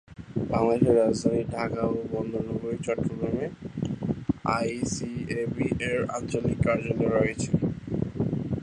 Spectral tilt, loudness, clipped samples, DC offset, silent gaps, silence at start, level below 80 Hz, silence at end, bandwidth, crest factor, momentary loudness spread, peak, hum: -6.5 dB/octave; -28 LUFS; under 0.1%; under 0.1%; none; 0.1 s; -48 dBFS; 0 s; 11 kHz; 20 dB; 9 LU; -8 dBFS; none